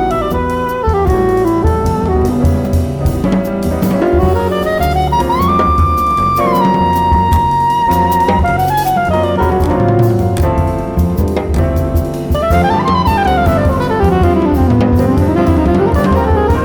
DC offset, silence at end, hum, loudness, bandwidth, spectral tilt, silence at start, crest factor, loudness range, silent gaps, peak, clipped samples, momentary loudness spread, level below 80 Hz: under 0.1%; 0 s; none; -12 LUFS; over 20 kHz; -7.5 dB/octave; 0 s; 10 dB; 2 LU; none; -2 dBFS; under 0.1%; 4 LU; -20 dBFS